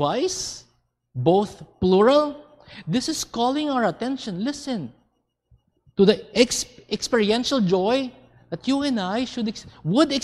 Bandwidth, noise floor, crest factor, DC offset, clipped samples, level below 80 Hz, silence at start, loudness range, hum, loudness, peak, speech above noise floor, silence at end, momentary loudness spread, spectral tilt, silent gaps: 14 kHz; -70 dBFS; 20 dB; under 0.1%; under 0.1%; -54 dBFS; 0 s; 4 LU; none; -23 LUFS; -4 dBFS; 48 dB; 0 s; 13 LU; -4.5 dB/octave; none